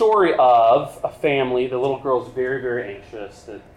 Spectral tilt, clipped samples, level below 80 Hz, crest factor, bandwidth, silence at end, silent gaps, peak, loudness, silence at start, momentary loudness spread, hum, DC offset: -6.5 dB/octave; under 0.1%; -54 dBFS; 12 dB; 12.5 kHz; 0.2 s; none; -6 dBFS; -19 LUFS; 0 s; 21 LU; none; under 0.1%